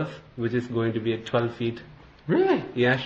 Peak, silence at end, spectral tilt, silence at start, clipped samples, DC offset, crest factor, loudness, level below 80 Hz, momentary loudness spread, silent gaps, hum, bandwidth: -10 dBFS; 0 s; -7.5 dB/octave; 0 s; under 0.1%; under 0.1%; 16 dB; -26 LUFS; -58 dBFS; 11 LU; none; none; 7.4 kHz